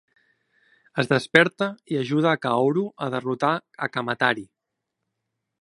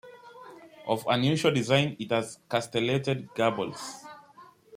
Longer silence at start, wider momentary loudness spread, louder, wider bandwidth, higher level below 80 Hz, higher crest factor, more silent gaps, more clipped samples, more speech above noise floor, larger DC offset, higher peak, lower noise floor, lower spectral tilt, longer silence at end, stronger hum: first, 0.95 s vs 0.05 s; second, 10 LU vs 23 LU; first, -23 LUFS vs -27 LUFS; second, 11.5 kHz vs 16 kHz; about the same, -68 dBFS vs -68 dBFS; about the same, 24 dB vs 20 dB; neither; neither; first, 59 dB vs 27 dB; neither; first, 0 dBFS vs -8 dBFS; first, -82 dBFS vs -54 dBFS; about the same, -6 dB/octave vs -5.5 dB/octave; first, 1.15 s vs 0 s; neither